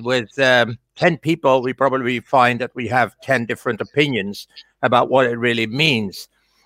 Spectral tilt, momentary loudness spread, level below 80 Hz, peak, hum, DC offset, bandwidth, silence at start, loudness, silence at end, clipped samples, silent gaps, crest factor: -5.5 dB/octave; 8 LU; -60 dBFS; -2 dBFS; none; under 0.1%; 16 kHz; 0 s; -18 LUFS; 0.4 s; under 0.1%; none; 18 dB